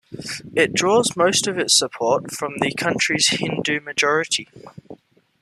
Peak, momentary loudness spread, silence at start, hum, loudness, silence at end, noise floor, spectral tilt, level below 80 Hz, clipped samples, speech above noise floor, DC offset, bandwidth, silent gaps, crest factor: -2 dBFS; 8 LU; 0.1 s; none; -19 LUFS; 0.45 s; -46 dBFS; -2.5 dB/octave; -60 dBFS; under 0.1%; 25 dB; under 0.1%; 14 kHz; none; 18 dB